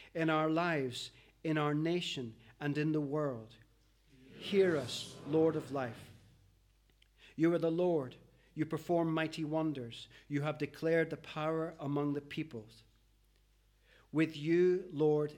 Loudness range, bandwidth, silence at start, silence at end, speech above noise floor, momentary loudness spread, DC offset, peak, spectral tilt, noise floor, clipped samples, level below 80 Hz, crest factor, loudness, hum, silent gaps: 2 LU; 16 kHz; 0 s; 0 s; 35 dB; 13 LU; under 0.1%; -18 dBFS; -6.5 dB/octave; -70 dBFS; under 0.1%; -70 dBFS; 18 dB; -35 LUFS; 50 Hz at -65 dBFS; none